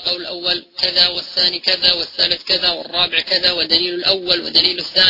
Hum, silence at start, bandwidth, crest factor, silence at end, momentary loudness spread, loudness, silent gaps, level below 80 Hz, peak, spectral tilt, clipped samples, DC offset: none; 0 s; 6 kHz; 18 dB; 0 s; 5 LU; -15 LUFS; none; -50 dBFS; 0 dBFS; -3 dB/octave; under 0.1%; under 0.1%